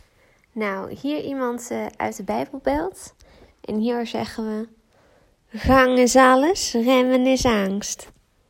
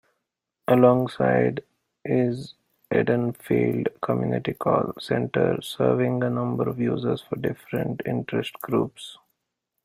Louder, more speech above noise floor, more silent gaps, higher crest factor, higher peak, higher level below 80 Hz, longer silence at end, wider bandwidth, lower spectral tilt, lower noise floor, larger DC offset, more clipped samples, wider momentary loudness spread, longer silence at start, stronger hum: first, -21 LUFS vs -24 LUFS; second, 38 dB vs 58 dB; neither; about the same, 18 dB vs 20 dB; about the same, -2 dBFS vs -4 dBFS; first, -42 dBFS vs -60 dBFS; second, 0.45 s vs 0.7 s; about the same, 16.5 kHz vs 16 kHz; second, -4 dB/octave vs -7.5 dB/octave; second, -59 dBFS vs -81 dBFS; neither; neither; first, 16 LU vs 8 LU; second, 0.55 s vs 0.7 s; neither